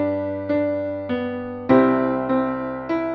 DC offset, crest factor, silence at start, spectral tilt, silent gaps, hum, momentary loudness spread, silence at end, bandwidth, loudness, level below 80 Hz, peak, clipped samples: under 0.1%; 18 dB; 0 s; -9.5 dB/octave; none; none; 10 LU; 0 s; 5.8 kHz; -22 LUFS; -54 dBFS; -4 dBFS; under 0.1%